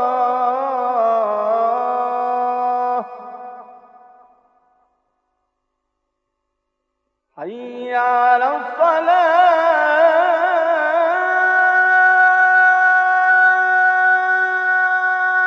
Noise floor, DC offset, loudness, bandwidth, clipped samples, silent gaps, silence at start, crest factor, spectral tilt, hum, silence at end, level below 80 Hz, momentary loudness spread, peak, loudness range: -75 dBFS; under 0.1%; -15 LUFS; 6.4 kHz; under 0.1%; none; 0 s; 14 dB; -3 dB/octave; none; 0 s; -72 dBFS; 11 LU; -2 dBFS; 12 LU